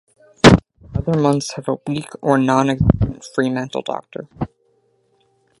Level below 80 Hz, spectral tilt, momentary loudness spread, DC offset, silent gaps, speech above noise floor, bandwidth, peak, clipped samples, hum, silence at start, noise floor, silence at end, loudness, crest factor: -34 dBFS; -6 dB/octave; 17 LU; under 0.1%; none; 43 dB; 11.5 kHz; 0 dBFS; under 0.1%; none; 0.45 s; -62 dBFS; 1.15 s; -18 LUFS; 18 dB